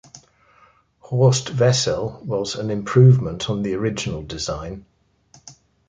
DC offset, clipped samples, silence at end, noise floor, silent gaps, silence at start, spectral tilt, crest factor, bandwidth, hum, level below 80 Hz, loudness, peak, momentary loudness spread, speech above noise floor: under 0.1%; under 0.1%; 0.35 s; -56 dBFS; none; 0.15 s; -5.5 dB/octave; 18 dB; 9.2 kHz; none; -46 dBFS; -20 LUFS; -2 dBFS; 13 LU; 37 dB